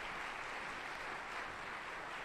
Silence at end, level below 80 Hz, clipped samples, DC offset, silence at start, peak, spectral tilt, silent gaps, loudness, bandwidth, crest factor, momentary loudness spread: 0 s; -64 dBFS; under 0.1%; under 0.1%; 0 s; -32 dBFS; -2.5 dB/octave; none; -44 LUFS; 13 kHz; 14 dB; 2 LU